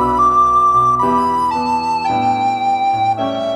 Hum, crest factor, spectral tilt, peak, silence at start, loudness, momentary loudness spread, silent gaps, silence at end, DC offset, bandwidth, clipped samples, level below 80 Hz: none; 10 dB; -5.5 dB/octave; -4 dBFS; 0 s; -14 LUFS; 6 LU; none; 0 s; under 0.1%; 12.5 kHz; under 0.1%; -42 dBFS